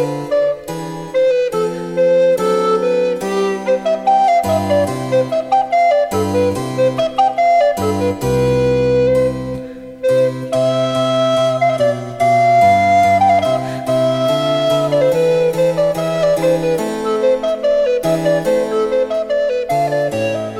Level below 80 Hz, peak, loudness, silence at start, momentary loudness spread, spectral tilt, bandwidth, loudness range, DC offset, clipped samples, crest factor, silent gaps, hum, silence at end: -44 dBFS; -2 dBFS; -15 LUFS; 0 s; 6 LU; -6 dB/octave; 15.5 kHz; 3 LU; under 0.1%; under 0.1%; 12 dB; none; none; 0 s